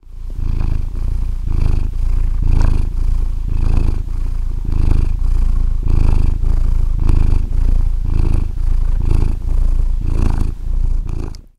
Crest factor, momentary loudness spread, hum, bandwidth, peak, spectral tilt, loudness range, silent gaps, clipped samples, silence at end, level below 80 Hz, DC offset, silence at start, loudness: 14 dB; 6 LU; none; 5 kHz; 0 dBFS; -8 dB/octave; 2 LU; none; under 0.1%; 0.15 s; -14 dBFS; under 0.1%; 0.05 s; -20 LUFS